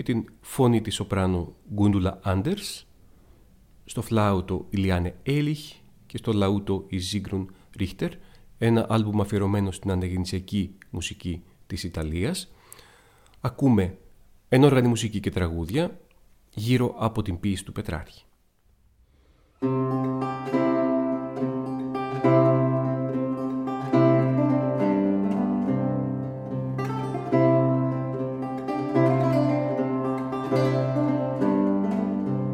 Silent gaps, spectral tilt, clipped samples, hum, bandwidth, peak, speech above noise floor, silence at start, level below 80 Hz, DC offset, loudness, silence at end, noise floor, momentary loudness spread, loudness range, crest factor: none; -7 dB/octave; under 0.1%; none; 16 kHz; -6 dBFS; 37 dB; 0 s; -48 dBFS; under 0.1%; -25 LUFS; 0 s; -62 dBFS; 12 LU; 6 LU; 20 dB